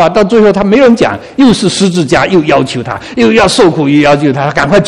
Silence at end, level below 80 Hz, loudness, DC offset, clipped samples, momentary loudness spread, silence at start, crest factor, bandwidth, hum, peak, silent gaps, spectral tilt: 0 s; -36 dBFS; -8 LUFS; under 0.1%; 2%; 5 LU; 0 s; 8 dB; 12 kHz; none; 0 dBFS; none; -5.5 dB/octave